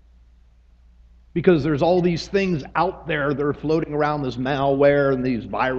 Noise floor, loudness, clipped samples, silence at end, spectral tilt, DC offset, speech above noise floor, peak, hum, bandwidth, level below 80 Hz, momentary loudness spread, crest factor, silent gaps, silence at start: -52 dBFS; -21 LUFS; under 0.1%; 0 s; -7.5 dB/octave; under 0.1%; 32 dB; -2 dBFS; none; 7.6 kHz; -46 dBFS; 7 LU; 18 dB; none; 1.35 s